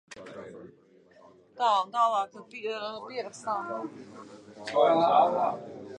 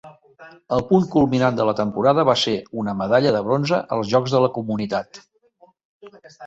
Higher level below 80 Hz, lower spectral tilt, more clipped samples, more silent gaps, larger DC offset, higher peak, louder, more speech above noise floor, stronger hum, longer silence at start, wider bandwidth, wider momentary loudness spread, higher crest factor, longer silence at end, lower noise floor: second, -78 dBFS vs -54 dBFS; second, -4.5 dB/octave vs -6.5 dB/octave; neither; second, none vs 5.85-6.00 s; neither; second, -10 dBFS vs -2 dBFS; second, -28 LUFS vs -20 LUFS; second, 31 dB vs 36 dB; neither; about the same, 0.1 s vs 0.05 s; first, 10 kHz vs 8.2 kHz; first, 24 LU vs 8 LU; about the same, 20 dB vs 18 dB; about the same, 0 s vs 0 s; about the same, -58 dBFS vs -56 dBFS